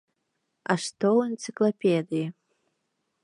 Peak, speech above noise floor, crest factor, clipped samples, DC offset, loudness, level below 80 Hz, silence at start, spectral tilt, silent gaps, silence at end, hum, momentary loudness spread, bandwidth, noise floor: -8 dBFS; 53 dB; 20 dB; under 0.1%; under 0.1%; -26 LUFS; -80 dBFS; 0.7 s; -5.5 dB/octave; none; 0.95 s; none; 9 LU; 11 kHz; -78 dBFS